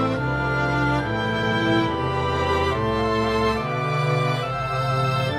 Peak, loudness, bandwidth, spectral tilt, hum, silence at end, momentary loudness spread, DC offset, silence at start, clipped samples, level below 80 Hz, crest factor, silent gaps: -8 dBFS; -22 LUFS; 13 kHz; -6.5 dB/octave; none; 0 s; 3 LU; under 0.1%; 0 s; under 0.1%; -38 dBFS; 14 dB; none